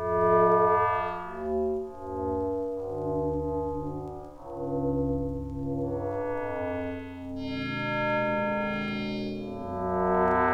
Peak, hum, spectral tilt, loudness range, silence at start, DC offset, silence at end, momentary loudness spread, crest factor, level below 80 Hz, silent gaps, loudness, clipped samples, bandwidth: -12 dBFS; none; -8 dB/octave; 5 LU; 0 s; under 0.1%; 0 s; 12 LU; 16 dB; -46 dBFS; none; -29 LUFS; under 0.1%; 8 kHz